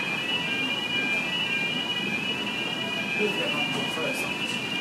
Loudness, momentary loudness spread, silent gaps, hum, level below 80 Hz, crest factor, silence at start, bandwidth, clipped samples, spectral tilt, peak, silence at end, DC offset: -26 LUFS; 3 LU; none; none; -68 dBFS; 14 dB; 0 s; 15.5 kHz; under 0.1%; -3 dB/octave; -14 dBFS; 0 s; under 0.1%